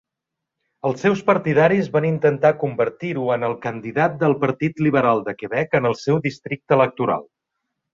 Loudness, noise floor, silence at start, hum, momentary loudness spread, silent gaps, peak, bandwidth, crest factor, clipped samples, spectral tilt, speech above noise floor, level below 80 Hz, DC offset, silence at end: -20 LUFS; -83 dBFS; 0.85 s; none; 8 LU; none; -2 dBFS; 7.6 kHz; 18 dB; under 0.1%; -7.5 dB/octave; 64 dB; -60 dBFS; under 0.1%; 0.7 s